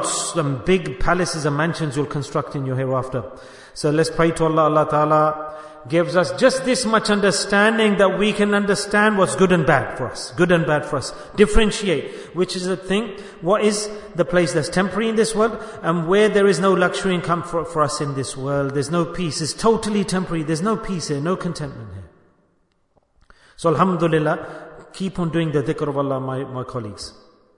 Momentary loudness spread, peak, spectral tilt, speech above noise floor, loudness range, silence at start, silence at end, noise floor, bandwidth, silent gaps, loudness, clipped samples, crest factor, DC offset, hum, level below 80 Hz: 12 LU; 0 dBFS; -5 dB/octave; 44 dB; 6 LU; 0 s; 0.45 s; -64 dBFS; 11 kHz; none; -20 LUFS; under 0.1%; 18 dB; under 0.1%; none; -38 dBFS